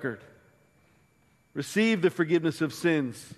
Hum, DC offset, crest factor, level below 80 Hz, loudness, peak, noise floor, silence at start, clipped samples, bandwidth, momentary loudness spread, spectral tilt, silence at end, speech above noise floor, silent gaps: none; under 0.1%; 18 dB; -72 dBFS; -27 LUFS; -12 dBFS; -65 dBFS; 0 s; under 0.1%; 13 kHz; 13 LU; -5.5 dB/octave; 0.05 s; 38 dB; none